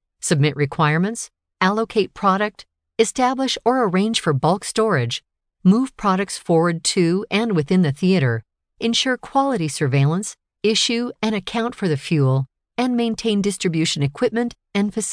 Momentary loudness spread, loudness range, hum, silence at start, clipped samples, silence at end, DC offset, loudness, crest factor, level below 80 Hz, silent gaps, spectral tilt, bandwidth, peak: 6 LU; 2 LU; none; 0.25 s; under 0.1%; 0 s; under 0.1%; -20 LUFS; 16 dB; -56 dBFS; none; -5 dB/octave; 11 kHz; -2 dBFS